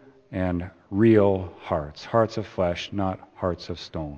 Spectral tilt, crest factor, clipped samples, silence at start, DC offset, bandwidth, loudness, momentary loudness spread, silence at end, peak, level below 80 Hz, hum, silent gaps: -7.5 dB/octave; 20 dB; under 0.1%; 0.3 s; under 0.1%; 7.2 kHz; -25 LUFS; 13 LU; 0 s; -6 dBFS; -50 dBFS; none; none